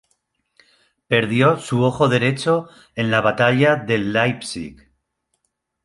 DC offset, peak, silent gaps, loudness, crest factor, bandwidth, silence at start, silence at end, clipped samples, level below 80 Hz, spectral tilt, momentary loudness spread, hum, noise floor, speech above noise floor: under 0.1%; -2 dBFS; none; -18 LUFS; 18 dB; 11.5 kHz; 1.1 s; 1.1 s; under 0.1%; -54 dBFS; -6 dB/octave; 13 LU; none; -73 dBFS; 54 dB